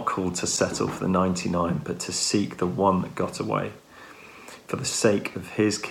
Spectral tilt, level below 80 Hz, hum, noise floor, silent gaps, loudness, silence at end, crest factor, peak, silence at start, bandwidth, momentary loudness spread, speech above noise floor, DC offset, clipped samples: -4.5 dB/octave; -56 dBFS; none; -47 dBFS; none; -25 LUFS; 0 s; 20 dB; -6 dBFS; 0 s; 16.5 kHz; 20 LU; 21 dB; under 0.1%; under 0.1%